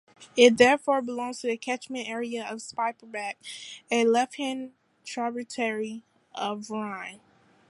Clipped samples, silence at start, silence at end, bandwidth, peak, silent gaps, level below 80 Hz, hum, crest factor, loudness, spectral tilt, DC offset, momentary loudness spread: under 0.1%; 0.2 s; 0.55 s; 11.5 kHz; -2 dBFS; none; -72 dBFS; none; 26 dB; -27 LUFS; -3 dB/octave; under 0.1%; 19 LU